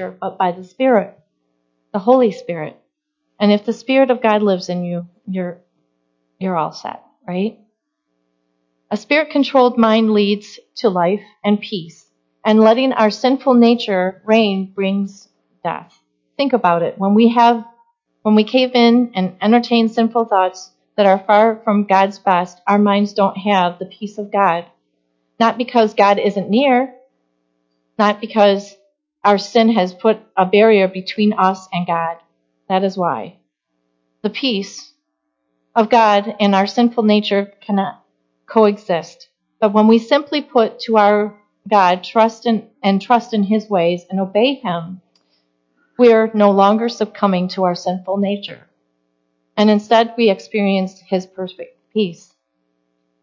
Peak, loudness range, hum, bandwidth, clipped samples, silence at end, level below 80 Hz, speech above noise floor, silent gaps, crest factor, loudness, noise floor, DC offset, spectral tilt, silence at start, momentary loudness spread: 0 dBFS; 5 LU; none; 7.4 kHz; under 0.1%; 1.1 s; -70 dBFS; 57 dB; none; 16 dB; -16 LUFS; -73 dBFS; under 0.1%; -6.5 dB/octave; 0 s; 14 LU